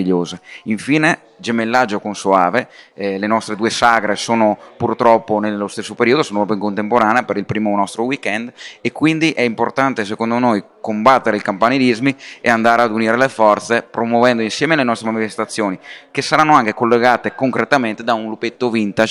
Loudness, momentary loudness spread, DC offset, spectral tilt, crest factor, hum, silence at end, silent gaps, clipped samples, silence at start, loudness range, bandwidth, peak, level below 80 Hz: -16 LUFS; 9 LU; under 0.1%; -5 dB/octave; 16 dB; none; 0 s; none; under 0.1%; 0 s; 3 LU; 12 kHz; 0 dBFS; -58 dBFS